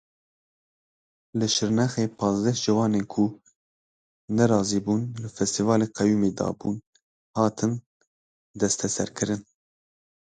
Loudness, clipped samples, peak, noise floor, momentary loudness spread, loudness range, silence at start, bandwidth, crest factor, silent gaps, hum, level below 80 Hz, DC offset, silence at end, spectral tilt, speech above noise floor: -25 LUFS; under 0.1%; -6 dBFS; under -90 dBFS; 9 LU; 4 LU; 1.35 s; 9.4 kHz; 20 dB; 3.55-4.28 s, 6.87-6.93 s, 7.03-7.34 s, 7.86-8.00 s, 8.07-8.54 s; none; -58 dBFS; under 0.1%; 0.85 s; -5 dB/octave; over 66 dB